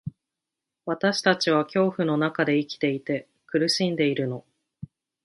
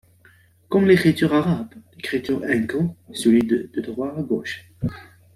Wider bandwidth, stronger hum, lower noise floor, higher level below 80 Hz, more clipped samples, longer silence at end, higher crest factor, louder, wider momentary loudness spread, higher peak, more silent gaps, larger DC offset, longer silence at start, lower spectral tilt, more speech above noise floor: second, 11.5 kHz vs 14.5 kHz; neither; first, -86 dBFS vs -54 dBFS; second, -66 dBFS vs -54 dBFS; neither; about the same, 0.4 s vs 0.35 s; about the same, 20 dB vs 18 dB; second, -24 LUFS vs -21 LUFS; first, 18 LU vs 14 LU; about the same, -6 dBFS vs -4 dBFS; neither; neither; second, 0.05 s vs 0.7 s; second, -5 dB/octave vs -6.5 dB/octave; first, 63 dB vs 34 dB